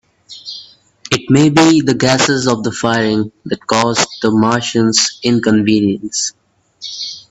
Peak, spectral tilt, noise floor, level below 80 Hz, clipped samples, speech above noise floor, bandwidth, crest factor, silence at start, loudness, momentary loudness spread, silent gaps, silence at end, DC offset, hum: 0 dBFS; -4 dB/octave; -39 dBFS; -50 dBFS; under 0.1%; 26 dB; 9.6 kHz; 14 dB; 0.3 s; -13 LUFS; 15 LU; none; 0.1 s; under 0.1%; none